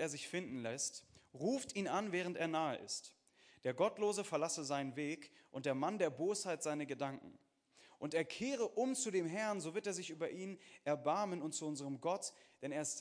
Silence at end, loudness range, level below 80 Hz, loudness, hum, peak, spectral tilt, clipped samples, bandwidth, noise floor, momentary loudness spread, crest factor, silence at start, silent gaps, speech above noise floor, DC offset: 0 s; 2 LU; -86 dBFS; -41 LUFS; none; -22 dBFS; -4 dB/octave; under 0.1%; 10.5 kHz; -69 dBFS; 8 LU; 20 dB; 0 s; none; 28 dB; under 0.1%